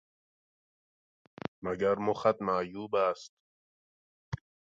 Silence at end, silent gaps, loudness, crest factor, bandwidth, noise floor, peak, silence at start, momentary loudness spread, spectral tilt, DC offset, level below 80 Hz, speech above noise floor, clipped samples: 0.3 s; 3.29-4.32 s; -31 LUFS; 22 dB; 7.8 kHz; under -90 dBFS; -12 dBFS; 1.6 s; 15 LU; -6.5 dB/octave; under 0.1%; -64 dBFS; over 60 dB; under 0.1%